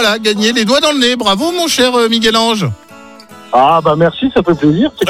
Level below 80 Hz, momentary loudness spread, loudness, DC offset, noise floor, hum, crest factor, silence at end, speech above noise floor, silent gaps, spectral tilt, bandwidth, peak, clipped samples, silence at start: -44 dBFS; 4 LU; -11 LUFS; under 0.1%; -36 dBFS; none; 12 dB; 0 s; 25 dB; none; -4 dB/octave; 16.5 kHz; 0 dBFS; under 0.1%; 0 s